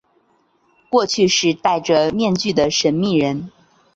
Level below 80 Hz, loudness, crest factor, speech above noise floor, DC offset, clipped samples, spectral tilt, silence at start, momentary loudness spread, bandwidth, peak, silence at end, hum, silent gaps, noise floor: -54 dBFS; -17 LUFS; 16 dB; 44 dB; under 0.1%; under 0.1%; -4 dB/octave; 0.9 s; 5 LU; 8 kHz; -2 dBFS; 0.45 s; none; none; -60 dBFS